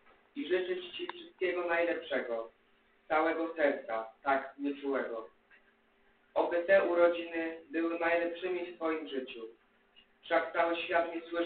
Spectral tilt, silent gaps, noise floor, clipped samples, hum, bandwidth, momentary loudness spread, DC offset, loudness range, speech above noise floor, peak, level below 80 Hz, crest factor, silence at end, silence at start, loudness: -1 dB/octave; none; -69 dBFS; under 0.1%; none; 4.5 kHz; 13 LU; under 0.1%; 4 LU; 36 dB; -14 dBFS; -74 dBFS; 20 dB; 0 s; 0.35 s; -33 LUFS